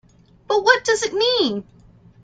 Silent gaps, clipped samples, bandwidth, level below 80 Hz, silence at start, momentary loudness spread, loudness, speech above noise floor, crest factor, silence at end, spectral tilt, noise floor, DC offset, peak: none; under 0.1%; 9.4 kHz; -58 dBFS; 0.5 s; 7 LU; -18 LUFS; 31 dB; 20 dB; 0.6 s; -2 dB/octave; -49 dBFS; under 0.1%; -2 dBFS